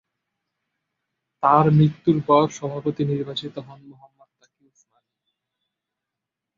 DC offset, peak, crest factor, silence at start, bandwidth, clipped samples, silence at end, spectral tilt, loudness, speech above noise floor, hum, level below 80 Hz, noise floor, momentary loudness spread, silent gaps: under 0.1%; -2 dBFS; 22 dB; 1.4 s; 7.6 kHz; under 0.1%; 2.65 s; -7.5 dB/octave; -20 LUFS; 65 dB; none; -62 dBFS; -85 dBFS; 14 LU; none